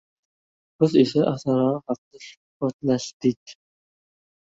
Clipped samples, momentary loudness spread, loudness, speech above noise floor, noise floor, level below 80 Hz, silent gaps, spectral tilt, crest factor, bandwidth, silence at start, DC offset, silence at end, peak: under 0.1%; 20 LU; -23 LUFS; over 68 dB; under -90 dBFS; -64 dBFS; 1.98-2.11 s, 2.37-2.60 s, 2.73-2.79 s, 3.13-3.20 s, 3.36-3.46 s; -7 dB/octave; 20 dB; 8 kHz; 0.8 s; under 0.1%; 1 s; -4 dBFS